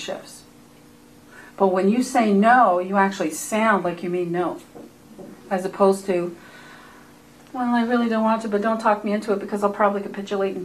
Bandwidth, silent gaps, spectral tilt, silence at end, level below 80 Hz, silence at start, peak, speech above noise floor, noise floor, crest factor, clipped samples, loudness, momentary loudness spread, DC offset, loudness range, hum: 14 kHz; none; -5.5 dB/octave; 0 s; -64 dBFS; 0 s; -4 dBFS; 28 dB; -49 dBFS; 18 dB; under 0.1%; -21 LUFS; 15 LU; under 0.1%; 6 LU; none